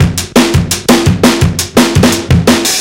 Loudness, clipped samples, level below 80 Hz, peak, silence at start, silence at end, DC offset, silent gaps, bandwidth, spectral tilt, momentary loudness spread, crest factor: -9 LUFS; 0.8%; -24 dBFS; 0 dBFS; 0 s; 0 s; 0.3%; none; 17.5 kHz; -4.5 dB/octave; 3 LU; 8 dB